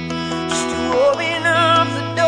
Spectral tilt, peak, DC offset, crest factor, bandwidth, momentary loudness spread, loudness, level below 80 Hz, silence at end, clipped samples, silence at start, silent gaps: -4 dB/octave; -4 dBFS; under 0.1%; 14 dB; 10.5 kHz; 8 LU; -17 LUFS; -48 dBFS; 0 s; under 0.1%; 0 s; none